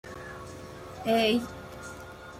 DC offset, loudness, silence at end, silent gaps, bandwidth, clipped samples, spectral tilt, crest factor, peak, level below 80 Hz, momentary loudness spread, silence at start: under 0.1%; -27 LUFS; 0 s; none; 16 kHz; under 0.1%; -4.5 dB/octave; 18 dB; -14 dBFS; -56 dBFS; 19 LU; 0.05 s